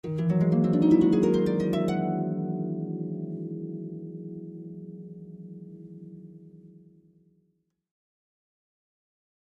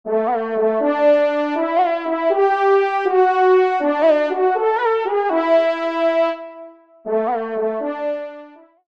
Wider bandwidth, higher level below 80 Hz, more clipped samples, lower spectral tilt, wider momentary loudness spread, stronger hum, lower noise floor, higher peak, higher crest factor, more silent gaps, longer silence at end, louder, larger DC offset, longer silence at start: first, 8.2 kHz vs 6.6 kHz; first, -60 dBFS vs -72 dBFS; neither; first, -9.5 dB/octave vs -5.5 dB/octave; first, 24 LU vs 8 LU; neither; first, -73 dBFS vs -42 dBFS; second, -10 dBFS vs -4 dBFS; about the same, 18 dB vs 14 dB; neither; first, 2.8 s vs 0.4 s; second, -26 LUFS vs -18 LUFS; second, under 0.1% vs 0.2%; about the same, 0.05 s vs 0.05 s